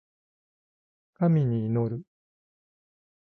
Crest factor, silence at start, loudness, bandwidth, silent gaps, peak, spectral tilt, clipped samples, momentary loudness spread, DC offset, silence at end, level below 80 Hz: 16 dB; 1.2 s; -26 LUFS; 4.1 kHz; none; -14 dBFS; -12 dB/octave; under 0.1%; 9 LU; under 0.1%; 1.3 s; -64 dBFS